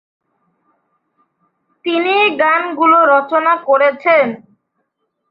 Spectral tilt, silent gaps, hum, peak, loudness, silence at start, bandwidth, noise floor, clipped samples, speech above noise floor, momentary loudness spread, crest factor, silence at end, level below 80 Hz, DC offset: -6.5 dB/octave; none; none; -2 dBFS; -13 LUFS; 1.85 s; 5.2 kHz; -70 dBFS; under 0.1%; 57 dB; 9 LU; 14 dB; 0.95 s; -68 dBFS; under 0.1%